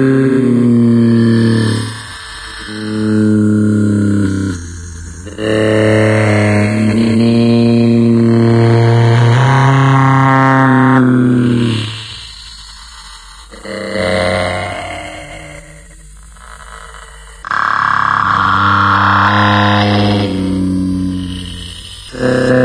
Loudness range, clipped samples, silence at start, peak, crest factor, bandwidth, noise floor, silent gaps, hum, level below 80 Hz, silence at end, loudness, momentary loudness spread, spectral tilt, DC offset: 10 LU; under 0.1%; 0 s; 0 dBFS; 12 dB; 11 kHz; -35 dBFS; none; none; -38 dBFS; 0 s; -11 LUFS; 19 LU; -7 dB/octave; under 0.1%